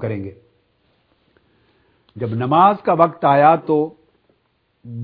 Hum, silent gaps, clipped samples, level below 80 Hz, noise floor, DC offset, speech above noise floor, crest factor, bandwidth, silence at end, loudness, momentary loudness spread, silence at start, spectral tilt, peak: none; none; under 0.1%; -64 dBFS; -65 dBFS; under 0.1%; 50 dB; 20 dB; 5 kHz; 0 s; -16 LUFS; 16 LU; 0 s; -11 dB/octave; 0 dBFS